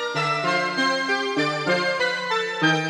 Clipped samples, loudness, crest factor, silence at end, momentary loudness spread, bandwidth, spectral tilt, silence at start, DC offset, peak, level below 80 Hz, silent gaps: under 0.1%; -22 LUFS; 16 dB; 0 s; 2 LU; 13.5 kHz; -4 dB/octave; 0 s; under 0.1%; -8 dBFS; -72 dBFS; none